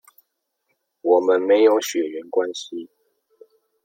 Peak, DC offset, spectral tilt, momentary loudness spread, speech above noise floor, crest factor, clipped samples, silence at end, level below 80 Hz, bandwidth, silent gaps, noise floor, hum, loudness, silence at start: -4 dBFS; under 0.1%; -3 dB/octave; 16 LU; 55 dB; 18 dB; under 0.1%; 1 s; -76 dBFS; 16 kHz; none; -74 dBFS; none; -19 LUFS; 1.05 s